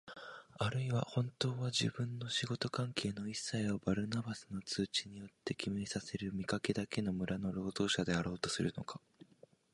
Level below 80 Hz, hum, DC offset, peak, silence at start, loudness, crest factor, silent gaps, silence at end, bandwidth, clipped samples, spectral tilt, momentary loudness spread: -64 dBFS; none; under 0.1%; -18 dBFS; 0.05 s; -38 LUFS; 20 dB; none; 0.75 s; 11.5 kHz; under 0.1%; -5 dB/octave; 9 LU